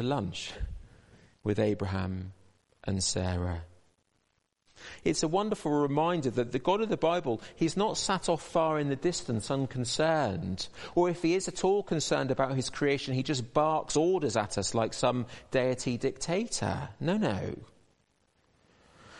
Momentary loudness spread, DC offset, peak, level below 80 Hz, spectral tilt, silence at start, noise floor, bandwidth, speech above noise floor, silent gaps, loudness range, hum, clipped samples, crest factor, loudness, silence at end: 9 LU; under 0.1%; -12 dBFS; -54 dBFS; -5 dB/octave; 0 s; -76 dBFS; 11.5 kHz; 46 dB; none; 5 LU; none; under 0.1%; 20 dB; -30 LUFS; 0 s